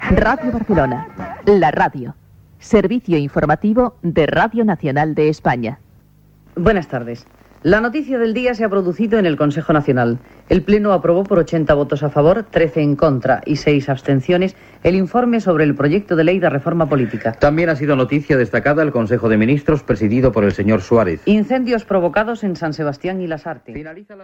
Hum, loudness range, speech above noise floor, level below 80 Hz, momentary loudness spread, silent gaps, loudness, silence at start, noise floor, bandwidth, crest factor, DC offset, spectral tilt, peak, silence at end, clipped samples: none; 3 LU; 33 dB; -36 dBFS; 8 LU; none; -16 LUFS; 0 s; -49 dBFS; 8 kHz; 16 dB; under 0.1%; -8 dB/octave; 0 dBFS; 0 s; under 0.1%